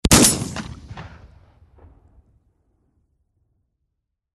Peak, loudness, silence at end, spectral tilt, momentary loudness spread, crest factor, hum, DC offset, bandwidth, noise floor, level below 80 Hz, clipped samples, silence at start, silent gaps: 0 dBFS; -16 LUFS; 3.3 s; -3 dB/octave; 26 LU; 24 dB; none; under 0.1%; 12 kHz; -78 dBFS; -36 dBFS; under 0.1%; 0.05 s; none